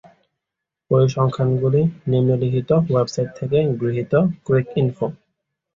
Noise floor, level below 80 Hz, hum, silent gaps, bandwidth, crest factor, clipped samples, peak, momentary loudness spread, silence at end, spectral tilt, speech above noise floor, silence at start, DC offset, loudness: -84 dBFS; -52 dBFS; none; none; 7.6 kHz; 16 dB; under 0.1%; -4 dBFS; 5 LU; 0.6 s; -8.5 dB/octave; 65 dB; 0.9 s; under 0.1%; -20 LUFS